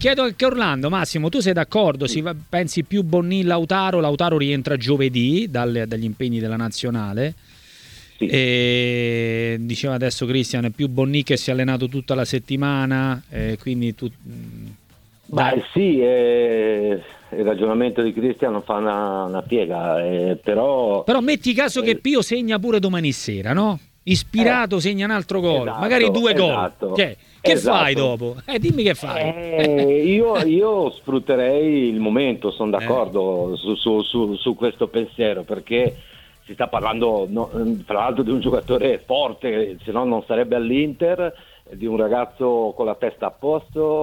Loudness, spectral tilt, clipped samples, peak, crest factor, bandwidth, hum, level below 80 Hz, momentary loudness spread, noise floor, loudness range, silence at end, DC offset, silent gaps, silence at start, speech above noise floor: -20 LUFS; -6 dB/octave; under 0.1%; -2 dBFS; 18 dB; 17.5 kHz; none; -48 dBFS; 7 LU; -53 dBFS; 4 LU; 0 s; under 0.1%; none; 0 s; 33 dB